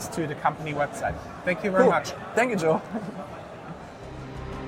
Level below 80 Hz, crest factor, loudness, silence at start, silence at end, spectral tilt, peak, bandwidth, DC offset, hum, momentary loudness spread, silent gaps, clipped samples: -50 dBFS; 20 dB; -26 LUFS; 0 s; 0 s; -5.5 dB/octave; -6 dBFS; 16 kHz; under 0.1%; none; 19 LU; none; under 0.1%